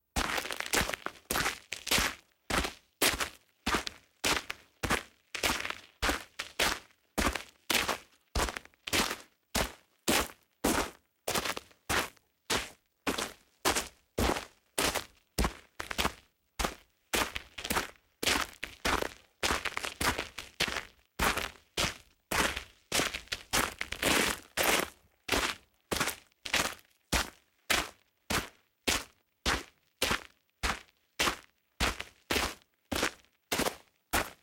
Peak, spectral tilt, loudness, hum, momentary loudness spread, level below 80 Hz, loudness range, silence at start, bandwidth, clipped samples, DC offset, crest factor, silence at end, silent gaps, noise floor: -10 dBFS; -2 dB/octave; -33 LUFS; none; 11 LU; -48 dBFS; 3 LU; 0.15 s; 17 kHz; under 0.1%; under 0.1%; 24 dB; 0.1 s; none; -55 dBFS